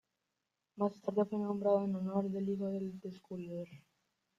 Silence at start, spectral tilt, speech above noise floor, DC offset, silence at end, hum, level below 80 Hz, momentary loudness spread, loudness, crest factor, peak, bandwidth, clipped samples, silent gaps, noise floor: 0.75 s; -9.5 dB/octave; 51 dB; under 0.1%; 0.6 s; none; -78 dBFS; 14 LU; -37 LUFS; 18 dB; -20 dBFS; 7.4 kHz; under 0.1%; none; -87 dBFS